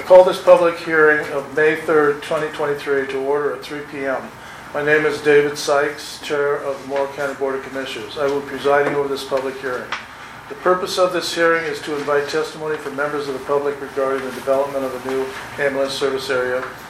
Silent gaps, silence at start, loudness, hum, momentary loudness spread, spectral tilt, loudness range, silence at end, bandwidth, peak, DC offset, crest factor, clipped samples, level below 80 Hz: none; 0 s; -19 LUFS; none; 11 LU; -4 dB/octave; 4 LU; 0 s; 15 kHz; 0 dBFS; under 0.1%; 18 dB; under 0.1%; -56 dBFS